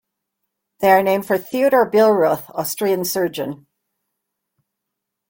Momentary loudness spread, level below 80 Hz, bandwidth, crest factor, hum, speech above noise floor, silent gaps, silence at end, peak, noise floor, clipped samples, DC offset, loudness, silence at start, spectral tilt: 10 LU; -64 dBFS; 17 kHz; 18 dB; none; 63 dB; none; 1.75 s; -2 dBFS; -80 dBFS; under 0.1%; under 0.1%; -17 LUFS; 0.8 s; -4.5 dB/octave